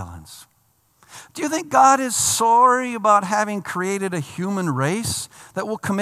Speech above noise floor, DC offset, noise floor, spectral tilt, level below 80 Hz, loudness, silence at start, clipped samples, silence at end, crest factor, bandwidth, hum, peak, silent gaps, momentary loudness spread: 43 dB; under 0.1%; -62 dBFS; -3.5 dB/octave; -60 dBFS; -19 LUFS; 0 s; under 0.1%; 0 s; 18 dB; 15 kHz; none; -2 dBFS; none; 14 LU